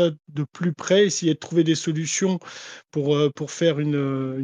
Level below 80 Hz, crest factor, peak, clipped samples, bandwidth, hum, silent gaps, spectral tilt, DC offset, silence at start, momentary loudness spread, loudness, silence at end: -72 dBFS; 16 dB; -6 dBFS; under 0.1%; 9.8 kHz; none; none; -5 dB/octave; under 0.1%; 0 s; 12 LU; -23 LUFS; 0 s